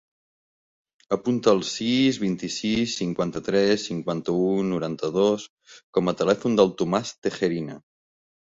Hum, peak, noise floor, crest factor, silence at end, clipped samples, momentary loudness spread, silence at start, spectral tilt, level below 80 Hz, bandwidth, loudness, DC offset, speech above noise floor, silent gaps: none; -4 dBFS; under -90 dBFS; 20 dB; 0.65 s; under 0.1%; 7 LU; 1.1 s; -5.5 dB/octave; -60 dBFS; 8 kHz; -24 LUFS; under 0.1%; over 66 dB; 5.49-5.57 s, 5.84-5.93 s, 7.18-7.22 s